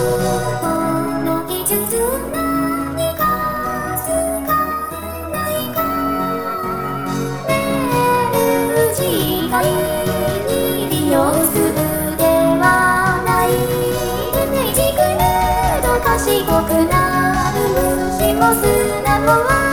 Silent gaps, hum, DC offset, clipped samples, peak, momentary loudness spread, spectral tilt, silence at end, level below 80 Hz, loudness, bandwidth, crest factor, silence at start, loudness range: none; none; 0.7%; under 0.1%; 0 dBFS; 7 LU; -4.5 dB/octave; 0 s; -32 dBFS; -16 LUFS; over 20 kHz; 16 dB; 0 s; 5 LU